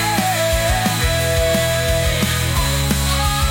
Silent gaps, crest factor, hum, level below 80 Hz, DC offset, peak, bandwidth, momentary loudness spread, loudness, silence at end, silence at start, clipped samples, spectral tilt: none; 12 dB; none; -24 dBFS; under 0.1%; -4 dBFS; 17 kHz; 1 LU; -17 LUFS; 0 s; 0 s; under 0.1%; -3.5 dB/octave